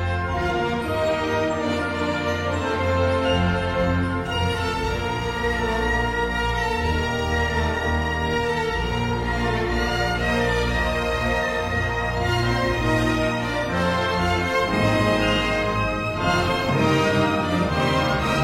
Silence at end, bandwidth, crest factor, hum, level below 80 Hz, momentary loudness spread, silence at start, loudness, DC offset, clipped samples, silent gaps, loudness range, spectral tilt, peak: 0 s; 16 kHz; 14 dB; none; -32 dBFS; 4 LU; 0 s; -22 LUFS; under 0.1%; under 0.1%; none; 2 LU; -5.5 dB/octave; -8 dBFS